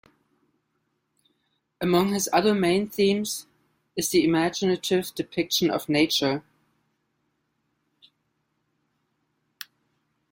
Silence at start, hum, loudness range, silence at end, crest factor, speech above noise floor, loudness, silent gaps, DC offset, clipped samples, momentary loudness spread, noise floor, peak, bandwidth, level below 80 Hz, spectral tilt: 1.8 s; none; 5 LU; 3.9 s; 20 dB; 52 dB; -24 LUFS; none; under 0.1%; under 0.1%; 13 LU; -75 dBFS; -6 dBFS; 16.5 kHz; -64 dBFS; -4 dB/octave